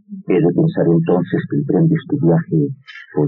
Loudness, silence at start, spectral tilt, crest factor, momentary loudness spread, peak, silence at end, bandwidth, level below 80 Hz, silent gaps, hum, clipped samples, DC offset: -16 LUFS; 0.1 s; -9.5 dB/octave; 12 dB; 6 LU; -4 dBFS; 0 s; 4.1 kHz; -56 dBFS; none; none; under 0.1%; under 0.1%